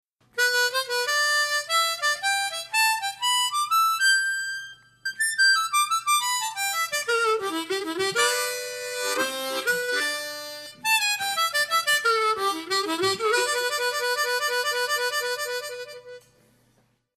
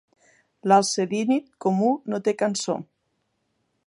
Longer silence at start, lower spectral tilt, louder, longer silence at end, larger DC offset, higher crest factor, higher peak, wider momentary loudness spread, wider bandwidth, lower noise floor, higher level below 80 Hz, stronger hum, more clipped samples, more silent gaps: second, 0.35 s vs 0.65 s; second, 0.5 dB/octave vs -4.5 dB/octave; about the same, -23 LUFS vs -23 LUFS; about the same, 1 s vs 1.05 s; neither; about the same, 16 dB vs 20 dB; second, -10 dBFS vs -4 dBFS; about the same, 10 LU vs 9 LU; first, 14 kHz vs 11.5 kHz; second, -66 dBFS vs -74 dBFS; about the same, -76 dBFS vs -76 dBFS; neither; neither; neither